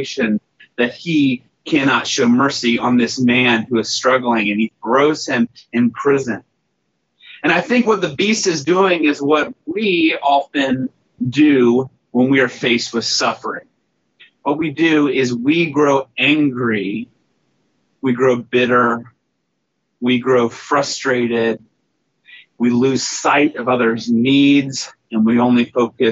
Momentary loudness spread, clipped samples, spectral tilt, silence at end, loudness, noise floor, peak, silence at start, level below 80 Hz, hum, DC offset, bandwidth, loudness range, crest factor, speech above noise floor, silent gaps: 9 LU; under 0.1%; -3.5 dB/octave; 0 s; -16 LUFS; -71 dBFS; -2 dBFS; 0 s; -62 dBFS; none; under 0.1%; 8 kHz; 3 LU; 16 dB; 55 dB; none